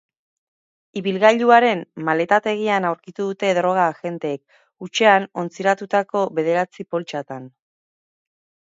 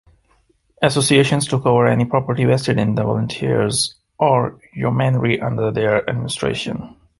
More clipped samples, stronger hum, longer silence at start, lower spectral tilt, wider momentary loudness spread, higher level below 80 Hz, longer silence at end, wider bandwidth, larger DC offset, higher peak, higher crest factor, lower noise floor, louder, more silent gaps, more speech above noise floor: neither; neither; first, 0.95 s vs 0.8 s; about the same, -5 dB/octave vs -5.5 dB/octave; first, 14 LU vs 8 LU; second, -74 dBFS vs -48 dBFS; first, 1.2 s vs 0.3 s; second, 7.8 kHz vs 12 kHz; neither; about the same, 0 dBFS vs -2 dBFS; about the same, 20 dB vs 16 dB; first, under -90 dBFS vs -60 dBFS; about the same, -19 LUFS vs -18 LUFS; neither; first, over 71 dB vs 42 dB